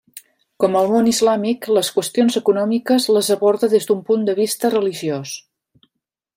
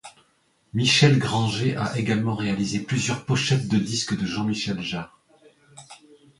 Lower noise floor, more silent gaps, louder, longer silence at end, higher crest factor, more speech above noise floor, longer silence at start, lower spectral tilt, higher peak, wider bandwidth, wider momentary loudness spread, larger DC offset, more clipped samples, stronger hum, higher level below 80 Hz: first, -78 dBFS vs -65 dBFS; neither; first, -17 LUFS vs -23 LUFS; first, 0.95 s vs 0.45 s; second, 16 dB vs 22 dB; first, 61 dB vs 42 dB; about the same, 0.15 s vs 0.05 s; about the same, -4.5 dB/octave vs -5 dB/octave; about the same, -2 dBFS vs -2 dBFS; first, 16 kHz vs 11.5 kHz; second, 6 LU vs 10 LU; neither; neither; neither; second, -64 dBFS vs -56 dBFS